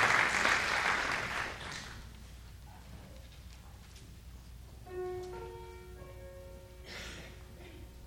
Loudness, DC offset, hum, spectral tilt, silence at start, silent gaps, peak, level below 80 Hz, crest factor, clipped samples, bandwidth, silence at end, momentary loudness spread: -33 LUFS; under 0.1%; none; -2.5 dB/octave; 0 s; none; -14 dBFS; -54 dBFS; 24 dB; under 0.1%; 19.5 kHz; 0 s; 24 LU